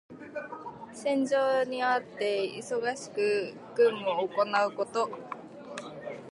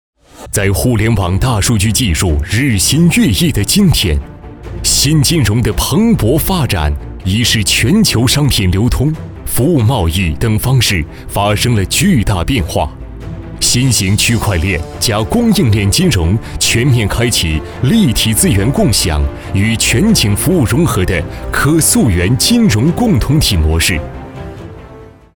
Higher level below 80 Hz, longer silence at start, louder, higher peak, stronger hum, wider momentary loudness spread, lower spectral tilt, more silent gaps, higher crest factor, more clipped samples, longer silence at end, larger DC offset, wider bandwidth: second, -78 dBFS vs -24 dBFS; second, 0.1 s vs 0.35 s; second, -29 LUFS vs -12 LUFS; second, -14 dBFS vs 0 dBFS; neither; first, 16 LU vs 8 LU; about the same, -4 dB/octave vs -4.5 dB/octave; neither; about the same, 16 dB vs 12 dB; neither; second, 0 s vs 0.25 s; second, under 0.1% vs 0.4%; second, 11.5 kHz vs over 20 kHz